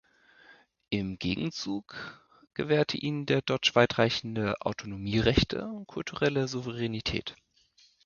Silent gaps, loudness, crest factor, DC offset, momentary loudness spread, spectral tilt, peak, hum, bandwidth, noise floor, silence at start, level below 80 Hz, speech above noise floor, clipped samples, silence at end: none; -29 LUFS; 24 dB; under 0.1%; 13 LU; -5.5 dB/octave; -6 dBFS; none; 7.2 kHz; -64 dBFS; 0.5 s; -48 dBFS; 35 dB; under 0.1%; 0.7 s